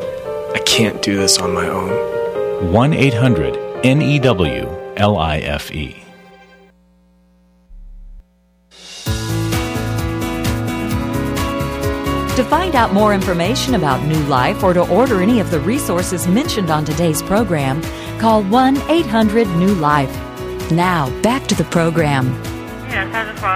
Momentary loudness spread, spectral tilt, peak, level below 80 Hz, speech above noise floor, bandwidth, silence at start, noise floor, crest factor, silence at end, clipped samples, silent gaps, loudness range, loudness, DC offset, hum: 9 LU; -5 dB/octave; 0 dBFS; -34 dBFS; 40 dB; 16 kHz; 0 s; -55 dBFS; 16 dB; 0 s; under 0.1%; none; 8 LU; -16 LUFS; under 0.1%; none